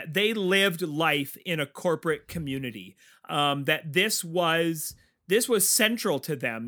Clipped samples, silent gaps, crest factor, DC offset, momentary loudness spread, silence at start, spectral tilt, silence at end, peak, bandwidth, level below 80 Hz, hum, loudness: under 0.1%; none; 20 dB; under 0.1%; 11 LU; 0 s; -3 dB/octave; 0 s; -6 dBFS; over 20 kHz; -62 dBFS; none; -25 LUFS